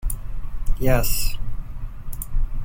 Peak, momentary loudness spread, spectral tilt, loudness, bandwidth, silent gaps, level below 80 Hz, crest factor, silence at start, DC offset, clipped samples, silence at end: -4 dBFS; 15 LU; -4.5 dB/octave; -27 LUFS; 17 kHz; none; -24 dBFS; 16 dB; 0 s; under 0.1%; under 0.1%; 0 s